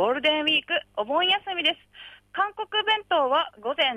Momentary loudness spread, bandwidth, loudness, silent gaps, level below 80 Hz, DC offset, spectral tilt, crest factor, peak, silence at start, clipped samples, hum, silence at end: 6 LU; 11.5 kHz; -24 LUFS; none; -68 dBFS; under 0.1%; -3.5 dB/octave; 14 dB; -10 dBFS; 0 s; under 0.1%; 50 Hz at -65 dBFS; 0 s